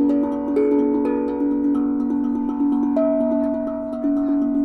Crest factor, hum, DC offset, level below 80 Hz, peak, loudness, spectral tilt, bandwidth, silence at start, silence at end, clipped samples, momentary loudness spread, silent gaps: 12 dB; none; under 0.1%; -50 dBFS; -8 dBFS; -21 LUFS; -9 dB/octave; 3.2 kHz; 0 s; 0 s; under 0.1%; 4 LU; none